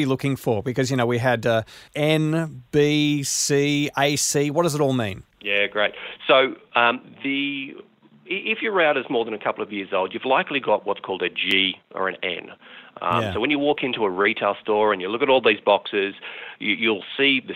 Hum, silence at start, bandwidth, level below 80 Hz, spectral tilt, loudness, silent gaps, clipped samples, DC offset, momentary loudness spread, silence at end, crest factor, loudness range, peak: none; 0 s; 16 kHz; -60 dBFS; -4 dB/octave; -22 LUFS; none; under 0.1%; under 0.1%; 9 LU; 0 s; 20 dB; 3 LU; -2 dBFS